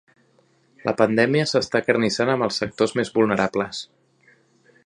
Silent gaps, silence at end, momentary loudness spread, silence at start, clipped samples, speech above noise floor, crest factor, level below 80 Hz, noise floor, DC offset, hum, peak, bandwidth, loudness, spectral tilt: none; 1 s; 10 LU; 0.85 s; under 0.1%; 40 dB; 22 dB; -60 dBFS; -61 dBFS; under 0.1%; none; -2 dBFS; 11 kHz; -21 LUFS; -5 dB/octave